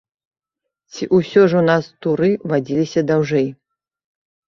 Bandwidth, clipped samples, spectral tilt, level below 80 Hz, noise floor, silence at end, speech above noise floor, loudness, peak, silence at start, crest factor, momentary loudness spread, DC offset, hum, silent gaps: 7.4 kHz; under 0.1%; -7 dB/octave; -58 dBFS; -76 dBFS; 1 s; 60 dB; -17 LUFS; -2 dBFS; 0.95 s; 18 dB; 9 LU; under 0.1%; none; none